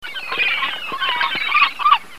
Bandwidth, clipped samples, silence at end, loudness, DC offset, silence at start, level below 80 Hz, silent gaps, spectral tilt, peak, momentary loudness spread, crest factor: 15.5 kHz; under 0.1%; 0 s; -17 LUFS; 2%; 0 s; -60 dBFS; none; -1 dB/octave; 0 dBFS; 8 LU; 18 dB